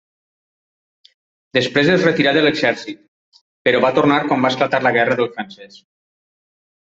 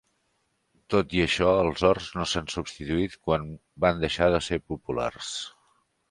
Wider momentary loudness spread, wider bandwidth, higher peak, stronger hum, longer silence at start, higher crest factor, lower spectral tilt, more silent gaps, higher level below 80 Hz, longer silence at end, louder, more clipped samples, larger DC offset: about the same, 13 LU vs 11 LU; second, 7.8 kHz vs 11.5 kHz; first, -2 dBFS vs -6 dBFS; neither; first, 1.55 s vs 0.9 s; about the same, 18 dB vs 22 dB; about the same, -5.5 dB/octave vs -5 dB/octave; first, 3.08-3.32 s, 3.41-3.65 s vs none; second, -60 dBFS vs -46 dBFS; first, 1.3 s vs 0.6 s; first, -16 LUFS vs -26 LUFS; neither; neither